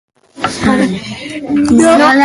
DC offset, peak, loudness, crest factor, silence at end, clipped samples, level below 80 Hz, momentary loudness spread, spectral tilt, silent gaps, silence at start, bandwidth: under 0.1%; 0 dBFS; -11 LUFS; 12 dB; 0 s; under 0.1%; -40 dBFS; 15 LU; -4.5 dB/octave; none; 0.35 s; 11.5 kHz